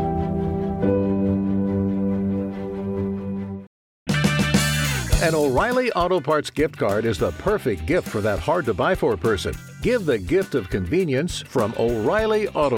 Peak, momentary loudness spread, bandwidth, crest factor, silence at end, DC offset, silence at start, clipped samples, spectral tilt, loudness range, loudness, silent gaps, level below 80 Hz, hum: -6 dBFS; 7 LU; 17 kHz; 16 dB; 0 s; under 0.1%; 0 s; under 0.1%; -5.5 dB/octave; 3 LU; -22 LUFS; 3.67-4.06 s; -36 dBFS; none